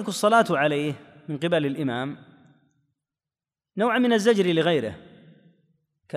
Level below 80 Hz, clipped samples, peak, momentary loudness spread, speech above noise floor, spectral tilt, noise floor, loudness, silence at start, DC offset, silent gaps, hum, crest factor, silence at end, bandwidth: -70 dBFS; under 0.1%; -6 dBFS; 15 LU; over 67 dB; -5.5 dB/octave; under -90 dBFS; -23 LUFS; 0 s; under 0.1%; none; none; 20 dB; 0 s; 15 kHz